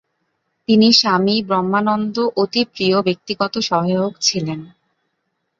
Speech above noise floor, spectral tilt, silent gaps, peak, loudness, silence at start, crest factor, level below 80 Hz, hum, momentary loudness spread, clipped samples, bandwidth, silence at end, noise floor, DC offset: 55 dB; -4.5 dB/octave; none; 0 dBFS; -17 LUFS; 0.7 s; 18 dB; -60 dBFS; none; 10 LU; under 0.1%; 7.6 kHz; 0.9 s; -72 dBFS; under 0.1%